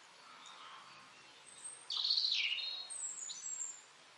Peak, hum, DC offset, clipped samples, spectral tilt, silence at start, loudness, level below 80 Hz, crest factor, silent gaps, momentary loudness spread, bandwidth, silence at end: -22 dBFS; none; under 0.1%; under 0.1%; 3.5 dB/octave; 0 s; -36 LUFS; under -90 dBFS; 22 dB; none; 24 LU; 11.5 kHz; 0 s